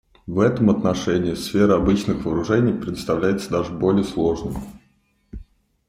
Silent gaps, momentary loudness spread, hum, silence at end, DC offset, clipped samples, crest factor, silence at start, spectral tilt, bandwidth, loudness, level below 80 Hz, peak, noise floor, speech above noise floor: none; 9 LU; none; 0.45 s; under 0.1%; under 0.1%; 18 dB; 0.25 s; -7 dB/octave; 15.5 kHz; -21 LUFS; -42 dBFS; -4 dBFS; -62 dBFS; 42 dB